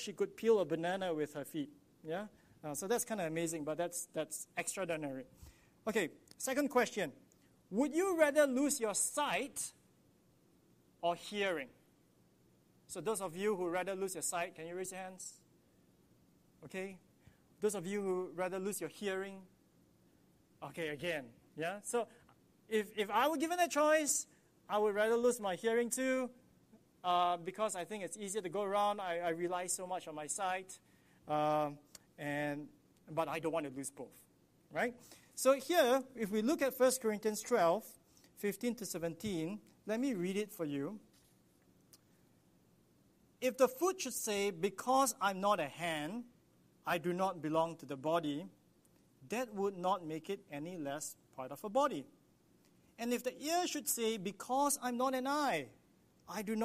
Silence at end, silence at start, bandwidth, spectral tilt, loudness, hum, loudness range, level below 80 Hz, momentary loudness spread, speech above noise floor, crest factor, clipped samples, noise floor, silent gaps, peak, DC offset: 0 s; 0 s; 15 kHz; -3.5 dB/octave; -37 LUFS; none; 8 LU; -78 dBFS; 13 LU; 33 dB; 22 dB; under 0.1%; -70 dBFS; none; -16 dBFS; under 0.1%